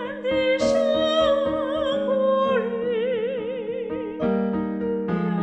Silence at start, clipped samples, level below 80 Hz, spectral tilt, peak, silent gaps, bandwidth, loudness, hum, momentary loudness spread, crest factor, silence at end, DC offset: 0 s; under 0.1%; -52 dBFS; -6 dB/octave; -10 dBFS; none; 8.8 kHz; -23 LUFS; none; 8 LU; 14 dB; 0 s; under 0.1%